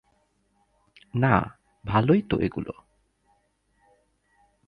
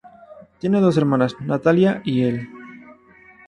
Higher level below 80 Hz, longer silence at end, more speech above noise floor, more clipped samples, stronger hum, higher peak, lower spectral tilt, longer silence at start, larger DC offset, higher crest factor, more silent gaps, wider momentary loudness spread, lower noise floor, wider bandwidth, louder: first, -50 dBFS vs -58 dBFS; first, 1.95 s vs 0.55 s; first, 46 dB vs 31 dB; neither; neither; about the same, -4 dBFS vs -4 dBFS; first, -9.5 dB/octave vs -8 dB/octave; first, 1.15 s vs 0.3 s; neither; first, 24 dB vs 16 dB; neither; first, 17 LU vs 13 LU; first, -69 dBFS vs -49 dBFS; second, 5.2 kHz vs 10.5 kHz; second, -25 LUFS vs -19 LUFS